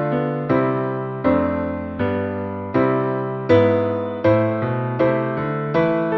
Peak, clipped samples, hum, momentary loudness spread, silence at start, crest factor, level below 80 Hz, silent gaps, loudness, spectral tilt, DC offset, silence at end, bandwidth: -4 dBFS; under 0.1%; none; 7 LU; 0 s; 16 dB; -50 dBFS; none; -20 LUFS; -10 dB/octave; under 0.1%; 0 s; 6 kHz